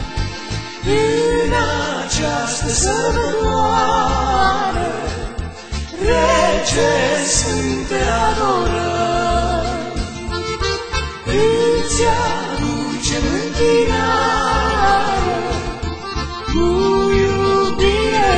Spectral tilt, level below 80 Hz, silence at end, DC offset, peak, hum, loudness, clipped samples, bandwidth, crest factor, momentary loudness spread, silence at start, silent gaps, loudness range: -4 dB/octave; -28 dBFS; 0 s; under 0.1%; -2 dBFS; none; -17 LUFS; under 0.1%; 9.2 kHz; 16 dB; 9 LU; 0 s; none; 2 LU